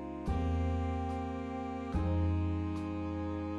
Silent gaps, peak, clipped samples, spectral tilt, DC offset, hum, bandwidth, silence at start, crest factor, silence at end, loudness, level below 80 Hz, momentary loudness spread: none; -22 dBFS; under 0.1%; -9 dB/octave; under 0.1%; none; 7.4 kHz; 0 s; 12 dB; 0 s; -36 LUFS; -42 dBFS; 6 LU